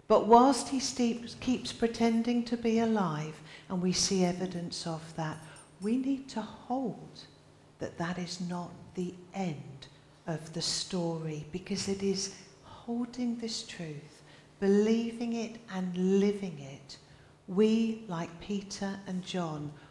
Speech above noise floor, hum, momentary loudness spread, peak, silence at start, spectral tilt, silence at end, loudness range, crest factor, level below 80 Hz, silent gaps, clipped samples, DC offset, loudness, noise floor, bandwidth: 27 dB; none; 16 LU; -8 dBFS; 0.1 s; -5 dB/octave; 0.05 s; 7 LU; 24 dB; -64 dBFS; none; under 0.1%; under 0.1%; -32 LUFS; -58 dBFS; 12 kHz